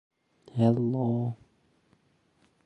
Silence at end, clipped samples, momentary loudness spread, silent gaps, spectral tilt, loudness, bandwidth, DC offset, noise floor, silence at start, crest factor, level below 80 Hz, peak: 1.3 s; under 0.1%; 13 LU; none; -10.5 dB/octave; -28 LUFS; 8.4 kHz; under 0.1%; -68 dBFS; 0.55 s; 20 dB; -68 dBFS; -10 dBFS